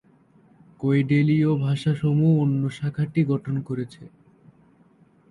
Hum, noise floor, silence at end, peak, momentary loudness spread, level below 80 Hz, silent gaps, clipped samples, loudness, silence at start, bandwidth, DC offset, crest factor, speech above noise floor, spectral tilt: none; -57 dBFS; 1.25 s; -10 dBFS; 10 LU; -60 dBFS; none; under 0.1%; -23 LUFS; 0.8 s; 10.5 kHz; under 0.1%; 14 dB; 35 dB; -9 dB/octave